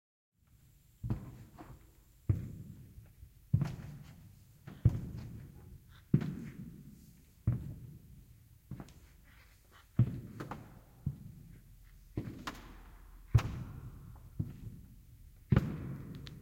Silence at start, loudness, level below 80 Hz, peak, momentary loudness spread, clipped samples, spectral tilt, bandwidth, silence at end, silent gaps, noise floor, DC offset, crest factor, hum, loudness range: 1 s; -38 LUFS; -50 dBFS; -14 dBFS; 25 LU; under 0.1%; -8 dB/octave; 16.5 kHz; 0 s; none; -65 dBFS; under 0.1%; 26 dB; none; 6 LU